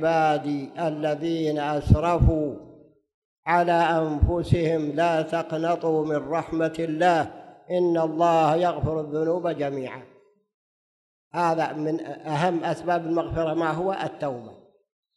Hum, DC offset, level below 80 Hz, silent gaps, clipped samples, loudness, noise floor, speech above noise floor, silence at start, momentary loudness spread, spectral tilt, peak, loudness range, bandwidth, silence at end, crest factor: none; under 0.1%; -38 dBFS; 3.14-3.43 s, 10.54-11.31 s; under 0.1%; -24 LUFS; under -90 dBFS; over 66 dB; 0 s; 9 LU; -7.5 dB/octave; -2 dBFS; 5 LU; 12 kHz; 0.6 s; 22 dB